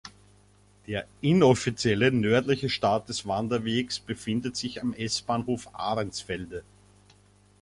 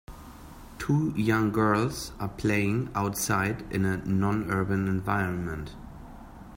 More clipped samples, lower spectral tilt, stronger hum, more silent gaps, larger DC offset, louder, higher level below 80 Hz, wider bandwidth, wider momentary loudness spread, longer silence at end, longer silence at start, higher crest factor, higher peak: neither; about the same, -5 dB/octave vs -6 dB/octave; first, 50 Hz at -50 dBFS vs none; neither; neither; about the same, -27 LUFS vs -28 LUFS; second, -56 dBFS vs -48 dBFS; second, 11.5 kHz vs 16.5 kHz; second, 13 LU vs 21 LU; first, 1 s vs 0 s; about the same, 0.05 s vs 0.1 s; about the same, 20 dB vs 18 dB; first, -6 dBFS vs -10 dBFS